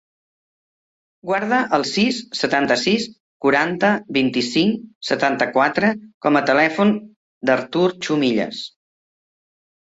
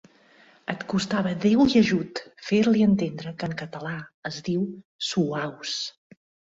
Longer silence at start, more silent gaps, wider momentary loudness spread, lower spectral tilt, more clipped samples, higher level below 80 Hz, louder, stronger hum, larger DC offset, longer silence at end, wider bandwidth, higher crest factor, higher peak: first, 1.25 s vs 0.7 s; first, 3.20-3.40 s, 4.95-5.01 s, 6.14-6.21 s, 7.16-7.41 s vs 4.14-4.22 s, 4.85-4.99 s; second, 8 LU vs 15 LU; about the same, -4.5 dB/octave vs -5.5 dB/octave; neither; about the same, -62 dBFS vs -58 dBFS; first, -19 LUFS vs -25 LUFS; neither; neither; first, 1.25 s vs 0.6 s; about the same, 8 kHz vs 7.8 kHz; about the same, 18 dB vs 18 dB; first, -2 dBFS vs -8 dBFS